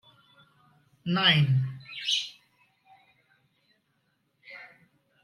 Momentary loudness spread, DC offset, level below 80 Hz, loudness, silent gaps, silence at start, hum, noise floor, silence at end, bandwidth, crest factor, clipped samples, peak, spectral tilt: 25 LU; under 0.1%; -72 dBFS; -26 LUFS; none; 1.05 s; none; -74 dBFS; 0.6 s; 12 kHz; 22 dB; under 0.1%; -8 dBFS; -4.5 dB/octave